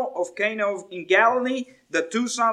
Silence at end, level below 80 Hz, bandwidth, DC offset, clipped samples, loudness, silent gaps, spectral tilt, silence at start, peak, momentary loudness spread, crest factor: 0 s; -78 dBFS; 13 kHz; under 0.1%; under 0.1%; -23 LUFS; none; -2.5 dB/octave; 0 s; -4 dBFS; 10 LU; 18 dB